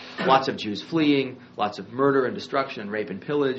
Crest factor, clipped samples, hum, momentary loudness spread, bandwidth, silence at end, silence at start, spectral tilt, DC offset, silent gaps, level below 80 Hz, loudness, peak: 18 dB; under 0.1%; none; 9 LU; 8 kHz; 0 s; 0 s; -3.5 dB/octave; under 0.1%; none; -68 dBFS; -25 LUFS; -6 dBFS